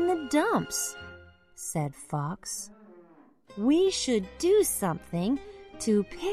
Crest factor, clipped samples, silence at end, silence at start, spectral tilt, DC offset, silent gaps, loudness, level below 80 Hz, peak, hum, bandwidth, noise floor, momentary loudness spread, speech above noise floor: 18 dB; under 0.1%; 0 s; 0 s; -4.5 dB/octave; under 0.1%; none; -28 LUFS; -56 dBFS; -12 dBFS; none; 14 kHz; -57 dBFS; 15 LU; 30 dB